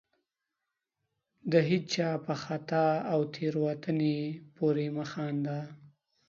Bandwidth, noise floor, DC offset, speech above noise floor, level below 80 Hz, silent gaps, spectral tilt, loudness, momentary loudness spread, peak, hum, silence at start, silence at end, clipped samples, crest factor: 7.4 kHz; -87 dBFS; under 0.1%; 56 dB; -74 dBFS; none; -6.5 dB/octave; -31 LUFS; 8 LU; -12 dBFS; none; 1.45 s; 0.4 s; under 0.1%; 20 dB